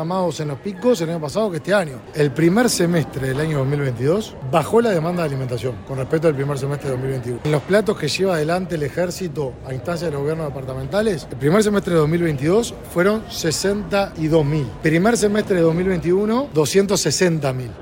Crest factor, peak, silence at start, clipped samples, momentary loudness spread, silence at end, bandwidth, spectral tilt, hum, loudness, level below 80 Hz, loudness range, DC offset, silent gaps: 16 dB; -4 dBFS; 0 s; under 0.1%; 8 LU; 0 s; 16.5 kHz; -5.5 dB/octave; none; -20 LUFS; -44 dBFS; 3 LU; under 0.1%; none